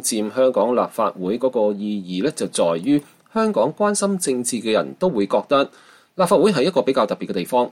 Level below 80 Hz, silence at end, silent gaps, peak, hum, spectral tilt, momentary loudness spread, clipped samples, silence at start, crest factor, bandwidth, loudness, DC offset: -64 dBFS; 0 s; none; -4 dBFS; none; -4.5 dB/octave; 6 LU; under 0.1%; 0 s; 14 dB; 16 kHz; -20 LUFS; under 0.1%